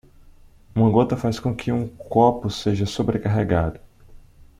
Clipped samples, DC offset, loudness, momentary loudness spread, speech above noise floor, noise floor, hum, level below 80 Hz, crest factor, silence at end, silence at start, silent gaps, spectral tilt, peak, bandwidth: under 0.1%; under 0.1%; -22 LUFS; 8 LU; 28 dB; -48 dBFS; none; -44 dBFS; 18 dB; 0.4 s; 0.75 s; none; -7.5 dB/octave; -4 dBFS; 12.5 kHz